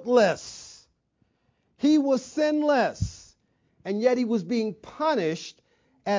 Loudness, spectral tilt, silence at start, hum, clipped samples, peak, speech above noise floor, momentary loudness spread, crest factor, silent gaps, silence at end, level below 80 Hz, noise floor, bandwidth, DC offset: -25 LUFS; -5.5 dB/octave; 0 s; none; under 0.1%; -8 dBFS; 47 dB; 17 LU; 18 dB; none; 0 s; -52 dBFS; -71 dBFS; 7.6 kHz; under 0.1%